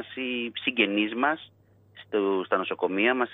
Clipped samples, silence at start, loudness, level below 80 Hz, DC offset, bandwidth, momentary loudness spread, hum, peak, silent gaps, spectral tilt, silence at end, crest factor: under 0.1%; 0 s; -26 LUFS; -78 dBFS; under 0.1%; 4 kHz; 7 LU; none; -8 dBFS; none; -7.5 dB/octave; 0 s; 20 dB